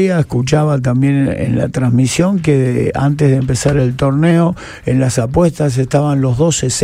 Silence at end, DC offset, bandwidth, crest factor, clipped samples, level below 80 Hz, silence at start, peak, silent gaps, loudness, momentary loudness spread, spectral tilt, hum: 0 s; under 0.1%; 13.5 kHz; 12 dB; under 0.1%; -36 dBFS; 0 s; 0 dBFS; none; -14 LUFS; 3 LU; -6.5 dB/octave; none